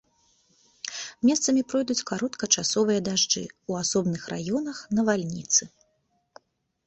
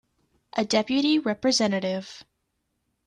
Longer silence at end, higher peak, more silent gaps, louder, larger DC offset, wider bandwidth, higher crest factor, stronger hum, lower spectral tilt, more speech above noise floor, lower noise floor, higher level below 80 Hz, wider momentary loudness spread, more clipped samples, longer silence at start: first, 1.2 s vs 0.85 s; first, -6 dBFS vs -10 dBFS; neither; about the same, -25 LUFS vs -24 LUFS; neither; second, 8.4 kHz vs 10.5 kHz; about the same, 22 dB vs 18 dB; neither; about the same, -3 dB/octave vs -4 dB/octave; second, 46 dB vs 52 dB; second, -72 dBFS vs -76 dBFS; about the same, -64 dBFS vs -66 dBFS; about the same, 9 LU vs 11 LU; neither; first, 0.85 s vs 0.55 s